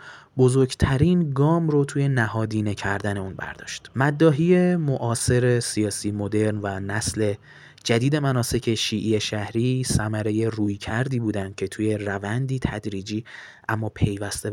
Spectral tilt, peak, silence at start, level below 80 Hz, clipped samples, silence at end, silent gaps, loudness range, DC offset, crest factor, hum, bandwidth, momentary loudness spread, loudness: -5.5 dB/octave; -6 dBFS; 0 s; -46 dBFS; under 0.1%; 0 s; none; 5 LU; under 0.1%; 18 dB; none; 16.5 kHz; 11 LU; -23 LUFS